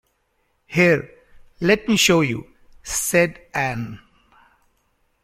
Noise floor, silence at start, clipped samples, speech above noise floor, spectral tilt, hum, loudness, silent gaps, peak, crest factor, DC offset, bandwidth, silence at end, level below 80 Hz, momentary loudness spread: -68 dBFS; 0.7 s; under 0.1%; 49 dB; -4 dB/octave; none; -19 LUFS; none; -2 dBFS; 20 dB; under 0.1%; 16.5 kHz; 1.25 s; -50 dBFS; 15 LU